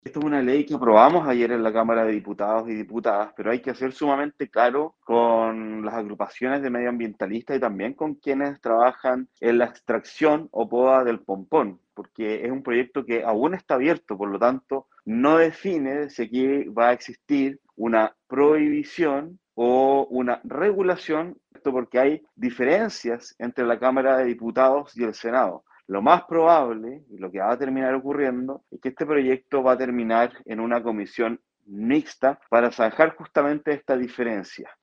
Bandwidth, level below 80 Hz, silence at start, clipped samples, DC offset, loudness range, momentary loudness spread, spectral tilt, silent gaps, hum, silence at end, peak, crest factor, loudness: 7.4 kHz; -68 dBFS; 0.05 s; under 0.1%; under 0.1%; 3 LU; 11 LU; -6.5 dB/octave; none; none; 0.1 s; 0 dBFS; 22 dB; -23 LUFS